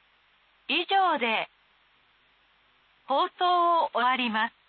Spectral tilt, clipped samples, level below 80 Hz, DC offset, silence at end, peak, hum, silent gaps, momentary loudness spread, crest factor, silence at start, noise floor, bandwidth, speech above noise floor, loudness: -7 dB/octave; under 0.1%; -82 dBFS; under 0.1%; 0.2 s; -14 dBFS; none; none; 7 LU; 14 dB; 0.7 s; -64 dBFS; 4.7 kHz; 39 dB; -25 LUFS